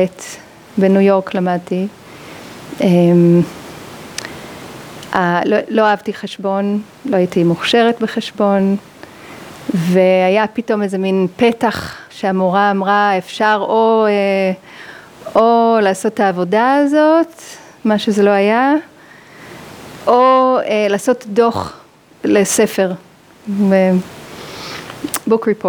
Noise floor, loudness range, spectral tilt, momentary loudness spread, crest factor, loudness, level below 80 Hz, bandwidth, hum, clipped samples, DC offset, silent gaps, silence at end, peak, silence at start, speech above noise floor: -40 dBFS; 3 LU; -5.5 dB/octave; 21 LU; 14 dB; -14 LUFS; -58 dBFS; over 20 kHz; none; under 0.1%; under 0.1%; none; 0 s; 0 dBFS; 0 s; 27 dB